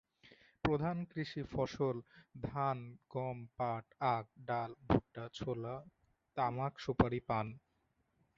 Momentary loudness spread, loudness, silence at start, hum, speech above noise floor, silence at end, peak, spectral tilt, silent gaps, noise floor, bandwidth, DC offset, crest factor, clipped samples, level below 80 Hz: 11 LU; -39 LUFS; 0.25 s; none; 41 dB; 0.8 s; -14 dBFS; -6 dB/octave; none; -80 dBFS; 7.4 kHz; under 0.1%; 24 dB; under 0.1%; -58 dBFS